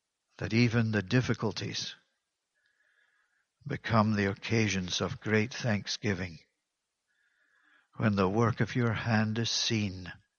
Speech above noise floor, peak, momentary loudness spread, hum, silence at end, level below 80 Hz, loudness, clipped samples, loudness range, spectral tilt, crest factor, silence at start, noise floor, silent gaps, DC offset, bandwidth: 55 dB; -10 dBFS; 10 LU; none; 0.25 s; -62 dBFS; -30 LUFS; under 0.1%; 4 LU; -5 dB/octave; 22 dB; 0.4 s; -85 dBFS; none; under 0.1%; 7.2 kHz